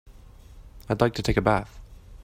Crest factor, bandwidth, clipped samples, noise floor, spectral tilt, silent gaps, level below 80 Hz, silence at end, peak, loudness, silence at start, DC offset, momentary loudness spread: 22 dB; 16 kHz; under 0.1%; -47 dBFS; -6.5 dB/octave; none; -40 dBFS; 0 s; -6 dBFS; -25 LUFS; 0.05 s; under 0.1%; 9 LU